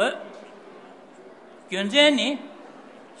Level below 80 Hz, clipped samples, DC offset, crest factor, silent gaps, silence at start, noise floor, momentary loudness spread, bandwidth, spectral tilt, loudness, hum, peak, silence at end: -84 dBFS; under 0.1%; under 0.1%; 22 dB; none; 0 s; -47 dBFS; 27 LU; 11 kHz; -3 dB/octave; -21 LUFS; none; -4 dBFS; 0.4 s